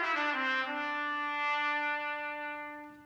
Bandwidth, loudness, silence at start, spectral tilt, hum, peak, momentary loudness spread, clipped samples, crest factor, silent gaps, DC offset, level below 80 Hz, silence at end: over 20 kHz; -33 LUFS; 0 s; -2 dB/octave; none; -20 dBFS; 9 LU; under 0.1%; 14 dB; none; under 0.1%; -80 dBFS; 0 s